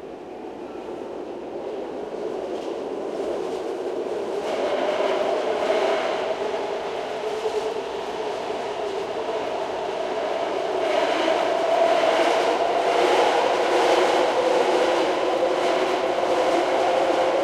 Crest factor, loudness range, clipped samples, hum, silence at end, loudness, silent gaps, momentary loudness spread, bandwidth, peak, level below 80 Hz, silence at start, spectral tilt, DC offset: 16 dB; 9 LU; under 0.1%; none; 0 s; -23 LUFS; none; 12 LU; 14 kHz; -8 dBFS; -62 dBFS; 0 s; -3.5 dB/octave; under 0.1%